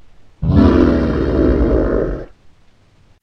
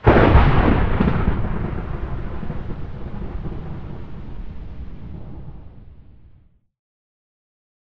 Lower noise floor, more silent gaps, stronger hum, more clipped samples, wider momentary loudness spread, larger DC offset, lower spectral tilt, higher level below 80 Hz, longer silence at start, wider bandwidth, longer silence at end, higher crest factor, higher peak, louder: about the same, -50 dBFS vs -52 dBFS; neither; neither; neither; second, 12 LU vs 22 LU; neither; about the same, -9.5 dB/octave vs -9.5 dB/octave; about the same, -22 dBFS vs -26 dBFS; first, 0.4 s vs 0 s; first, 6.4 kHz vs 5.6 kHz; second, 0.95 s vs 1.7 s; about the same, 16 dB vs 20 dB; about the same, 0 dBFS vs 0 dBFS; first, -15 LUFS vs -21 LUFS